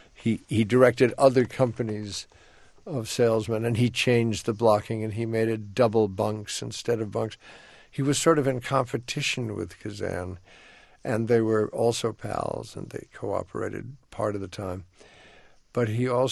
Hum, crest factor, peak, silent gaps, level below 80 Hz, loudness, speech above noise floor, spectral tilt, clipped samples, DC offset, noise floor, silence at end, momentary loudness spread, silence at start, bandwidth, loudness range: none; 22 dB; -4 dBFS; none; -58 dBFS; -26 LUFS; 28 dB; -5.5 dB/octave; under 0.1%; under 0.1%; -54 dBFS; 0 s; 15 LU; 0.2 s; 12.5 kHz; 6 LU